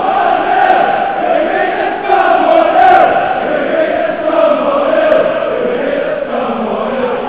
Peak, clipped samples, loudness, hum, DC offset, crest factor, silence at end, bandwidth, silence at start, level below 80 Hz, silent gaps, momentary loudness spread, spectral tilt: 0 dBFS; 0.2%; -11 LUFS; none; 0.7%; 12 dB; 0 s; 4 kHz; 0 s; -48 dBFS; none; 8 LU; -8 dB/octave